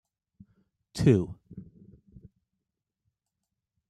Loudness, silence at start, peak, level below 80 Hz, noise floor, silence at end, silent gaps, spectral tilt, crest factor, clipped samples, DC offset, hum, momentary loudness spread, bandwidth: -26 LUFS; 0.95 s; -8 dBFS; -56 dBFS; -86 dBFS; 2.25 s; none; -7.5 dB/octave; 24 dB; under 0.1%; under 0.1%; none; 25 LU; 12.5 kHz